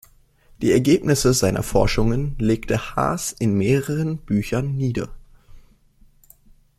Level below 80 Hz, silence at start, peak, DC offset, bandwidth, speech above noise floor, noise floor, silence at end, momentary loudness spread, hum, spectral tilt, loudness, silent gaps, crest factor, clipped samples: -36 dBFS; 0.6 s; -4 dBFS; under 0.1%; 16 kHz; 34 dB; -54 dBFS; 1.2 s; 7 LU; none; -5.5 dB/octave; -21 LUFS; none; 18 dB; under 0.1%